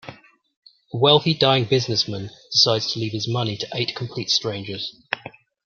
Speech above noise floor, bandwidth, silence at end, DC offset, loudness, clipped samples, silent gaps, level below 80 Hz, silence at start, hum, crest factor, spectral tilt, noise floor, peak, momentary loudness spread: 22 dB; 7.2 kHz; 0.35 s; under 0.1%; -21 LUFS; under 0.1%; 0.56-0.62 s; -62 dBFS; 0.05 s; none; 22 dB; -4.5 dB/octave; -44 dBFS; 0 dBFS; 14 LU